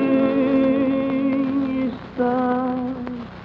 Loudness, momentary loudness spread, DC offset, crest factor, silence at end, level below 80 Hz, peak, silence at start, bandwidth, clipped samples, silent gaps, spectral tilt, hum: -21 LUFS; 9 LU; under 0.1%; 12 dB; 0 s; -52 dBFS; -8 dBFS; 0 s; 5 kHz; under 0.1%; none; -9 dB/octave; none